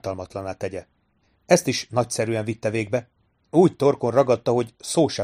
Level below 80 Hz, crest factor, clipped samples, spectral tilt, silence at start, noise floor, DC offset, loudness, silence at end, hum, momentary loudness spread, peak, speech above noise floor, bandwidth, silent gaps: -60 dBFS; 22 dB; under 0.1%; -5.5 dB/octave; 0.05 s; -66 dBFS; under 0.1%; -23 LUFS; 0 s; none; 12 LU; -2 dBFS; 44 dB; 15.5 kHz; none